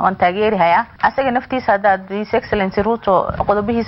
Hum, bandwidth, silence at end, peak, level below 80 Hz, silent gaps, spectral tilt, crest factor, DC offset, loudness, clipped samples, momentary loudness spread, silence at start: none; 6 kHz; 0 s; -2 dBFS; -40 dBFS; none; -8.5 dB/octave; 16 dB; under 0.1%; -16 LUFS; under 0.1%; 4 LU; 0 s